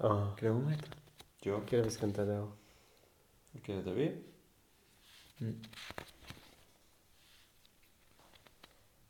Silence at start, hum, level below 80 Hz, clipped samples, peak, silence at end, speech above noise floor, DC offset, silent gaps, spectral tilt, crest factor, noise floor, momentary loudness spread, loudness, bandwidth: 0 s; none; -68 dBFS; under 0.1%; -16 dBFS; 2.6 s; 32 dB; under 0.1%; none; -7 dB/octave; 24 dB; -68 dBFS; 25 LU; -38 LUFS; 18 kHz